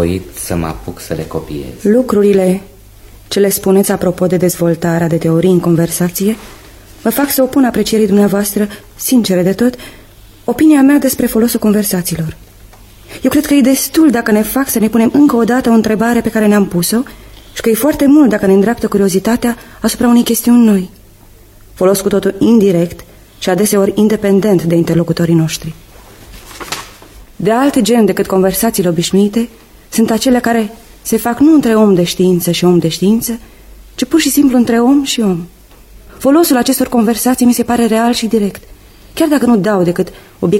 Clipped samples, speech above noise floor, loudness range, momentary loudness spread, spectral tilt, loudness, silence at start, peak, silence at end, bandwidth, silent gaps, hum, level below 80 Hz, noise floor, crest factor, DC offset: under 0.1%; 29 dB; 3 LU; 11 LU; -5.5 dB/octave; -12 LUFS; 0 s; 0 dBFS; 0 s; 16.5 kHz; none; none; -38 dBFS; -40 dBFS; 12 dB; under 0.1%